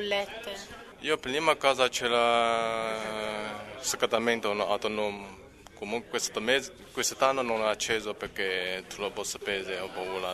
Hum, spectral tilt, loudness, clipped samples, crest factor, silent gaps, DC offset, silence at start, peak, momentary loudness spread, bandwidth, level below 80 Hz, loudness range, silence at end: none; -2 dB/octave; -29 LUFS; under 0.1%; 22 dB; none; under 0.1%; 0 s; -8 dBFS; 12 LU; 13.5 kHz; -60 dBFS; 3 LU; 0 s